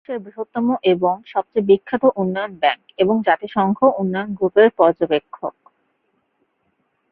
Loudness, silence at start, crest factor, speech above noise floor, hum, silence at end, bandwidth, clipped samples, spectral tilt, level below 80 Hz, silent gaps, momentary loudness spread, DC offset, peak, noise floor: -18 LUFS; 0.1 s; 18 dB; 50 dB; none; 1.6 s; 4.6 kHz; under 0.1%; -10.5 dB/octave; -62 dBFS; none; 12 LU; under 0.1%; -2 dBFS; -68 dBFS